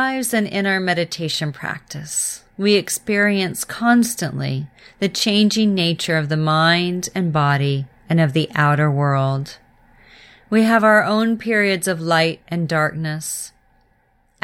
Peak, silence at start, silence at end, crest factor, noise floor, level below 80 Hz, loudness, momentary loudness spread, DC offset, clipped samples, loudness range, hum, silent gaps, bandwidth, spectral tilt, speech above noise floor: -2 dBFS; 0 s; 0.95 s; 16 dB; -60 dBFS; -56 dBFS; -18 LUFS; 10 LU; under 0.1%; under 0.1%; 2 LU; none; none; 16.5 kHz; -4.5 dB/octave; 42 dB